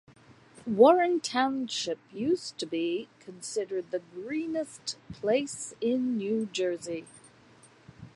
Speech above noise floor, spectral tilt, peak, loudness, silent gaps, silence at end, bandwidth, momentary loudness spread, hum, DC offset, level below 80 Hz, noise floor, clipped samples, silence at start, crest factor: 28 dB; -4 dB/octave; -8 dBFS; -29 LUFS; none; 0.05 s; 11.5 kHz; 15 LU; none; under 0.1%; -70 dBFS; -57 dBFS; under 0.1%; 0.6 s; 22 dB